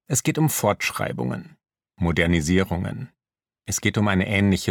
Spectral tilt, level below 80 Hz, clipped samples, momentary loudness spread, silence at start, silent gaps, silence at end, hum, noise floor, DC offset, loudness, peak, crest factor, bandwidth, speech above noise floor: -5 dB/octave; -44 dBFS; under 0.1%; 12 LU; 0.1 s; none; 0 s; none; -80 dBFS; under 0.1%; -22 LUFS; -4 dBFS; 18 dB; 19 kHz; 58 dB